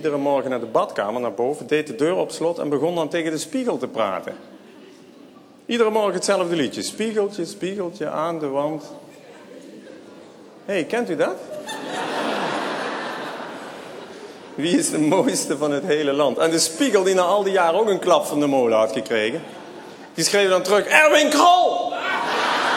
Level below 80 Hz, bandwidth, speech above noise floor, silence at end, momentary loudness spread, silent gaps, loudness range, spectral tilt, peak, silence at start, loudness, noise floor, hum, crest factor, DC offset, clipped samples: -72 dBFS; 18 kHz; 26 dB; 0 s; 17 LU; none; 10 LU; -3.5 dB/octave; 0 dBFS; 0 s; -20 LUFS; -46 dBFS; none; 22 dB; under 0.1%; under 0.1%